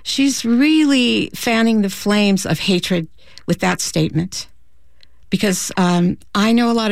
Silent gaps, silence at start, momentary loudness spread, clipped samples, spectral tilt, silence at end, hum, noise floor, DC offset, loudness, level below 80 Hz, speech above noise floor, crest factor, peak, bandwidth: none; 0.05 s; 10 LU; under 0.1%; -4.5 dB/octave; 0 s; none; -55 dBFS; 1%; -17 LUFS; -48 dBFS; 39 dB; 12 dB; -6 dBFS; 16 kHz